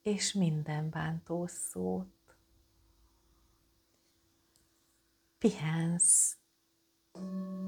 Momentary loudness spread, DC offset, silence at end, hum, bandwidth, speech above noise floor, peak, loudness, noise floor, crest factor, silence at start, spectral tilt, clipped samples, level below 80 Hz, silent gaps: 17 LU; under 0.1%; 0 s; none; 18.5 kHz; 42 dB; -14 dBFS; -31 LUFS; -75 dBFS; 20 dB; 0.05 s; -4 dB/octave; under 0.1%; -70 dBFS; none